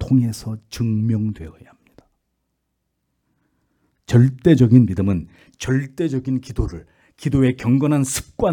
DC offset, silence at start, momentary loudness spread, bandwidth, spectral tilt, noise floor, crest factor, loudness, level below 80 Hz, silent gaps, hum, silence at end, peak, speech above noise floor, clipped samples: under 0.1%; 0 s; 15 LU; 18 kHz; -7 dB/octave; -74 dBFS; 18 dB; -19 LUFS; -40 dBFS; none; none; 0 s; -2 dBFS; 56 dB; under 0.1%